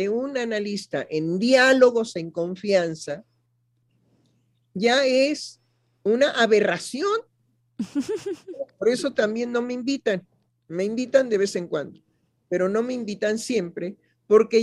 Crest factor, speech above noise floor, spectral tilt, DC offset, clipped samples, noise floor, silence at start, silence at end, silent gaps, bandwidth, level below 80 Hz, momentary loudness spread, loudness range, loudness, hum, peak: 20 dB; 46 dB; -4.5 dB/octave; under 0.1%; under 0.1%; -69 dBFS; 0 s; 0 s; none; 12 kHz; -72 dBFS; 15 LU; 5 LU; -23 LUFS; none; -4 dBFS